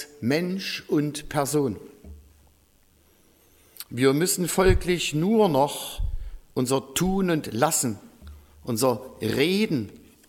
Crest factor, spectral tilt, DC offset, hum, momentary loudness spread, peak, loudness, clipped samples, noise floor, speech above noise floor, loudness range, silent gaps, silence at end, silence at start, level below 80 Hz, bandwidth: 20 dB; -4.5 dB/octave; under 0.1%; none; 13 LU; -6 dBFS; -24 LUFS; under 0.1%; -60 dBFS; 36 dB; 6 LU; none; 0.3 s; 0 s; -38 dBFS; 17.5 kHz